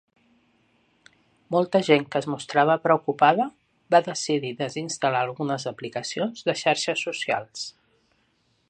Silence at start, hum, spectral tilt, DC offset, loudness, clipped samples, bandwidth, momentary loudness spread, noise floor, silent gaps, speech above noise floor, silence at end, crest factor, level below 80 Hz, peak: 1.5 s; none; -4 dB/octave; under 0.1%; -24 LUFS; under 0.1%; 9.8 kHz; 10 LU; -68 dBFS; none; 44 dB; 1 s; 22 dB; -72 dBFS; -4 dBFS